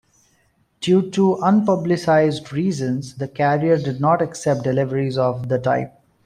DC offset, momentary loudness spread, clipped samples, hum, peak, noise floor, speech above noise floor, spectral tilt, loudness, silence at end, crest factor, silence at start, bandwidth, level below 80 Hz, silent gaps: under 0.1%; 7 LU; under 0.1%; none; -4 dBFS; -62 dBFS; 44 dB; -7 dB/octave; -19 LUFS; 0.35 s; 14 dB; 0.8 s; 11.5 kHz; -58 dBFS; none